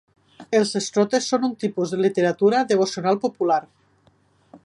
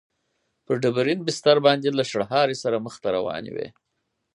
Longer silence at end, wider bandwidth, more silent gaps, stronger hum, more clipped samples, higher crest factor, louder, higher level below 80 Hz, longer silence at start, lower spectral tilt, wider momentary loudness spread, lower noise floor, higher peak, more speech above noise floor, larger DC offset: second, 0.05 s vs 0.65 s; about the same, 11.5 kHz vs 11.5 kHz; neither; neither; neither; about the same, 16 dB vs 20 dB; about the same, -21 LUFS vs -23 LUFS; about the same, -70 dBFS vs -66 dBFS; second, 0.4 s vs 0.7 s; about the same, -4.5 dB/octave vs -5 dB/octave; second, 5 LU vs 13 LU; second, -60 dBFS vs -74 dBFS; about the same, -6 dBFS vs -4 dBFS; second, 39 dB vs 51 dB; neither